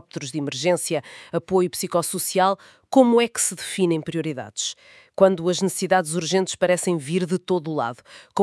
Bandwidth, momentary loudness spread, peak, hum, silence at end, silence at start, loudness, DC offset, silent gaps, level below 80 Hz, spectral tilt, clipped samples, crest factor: 12 kHz; 12 LU; -2 dBFS; none; 0 s; 0.15 s; -22 LUFS; under 0.1%; none; -68 dBFS; -4.5 dB/octave; under 0.1%; 20 dB